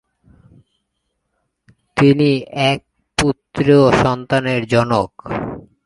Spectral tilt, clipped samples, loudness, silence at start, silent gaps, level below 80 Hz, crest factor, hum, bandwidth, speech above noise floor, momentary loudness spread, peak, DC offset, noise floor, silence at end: -6 dB/octave; under 0.1%; -16 LUFS; 1.95 s; none; -44 dBFS; 18 dB; none; 11.5 kHz; 57 dB; 13 LU; 0 dBFS; under 0.1%; -72 dBFS; 0.25 s